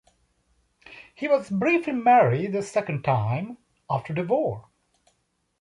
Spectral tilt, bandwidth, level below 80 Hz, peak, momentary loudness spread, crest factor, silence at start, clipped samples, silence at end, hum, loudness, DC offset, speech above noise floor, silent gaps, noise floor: -7.5 dB/octave; 11.5 kHz; -62 dBFS; -8 dBFS; 13 LU; 18 dB; 0.9 s; under 0.1%; 1 s; none; -24 LUFS; under 0.1%; 49 dB; none; -72 dBFS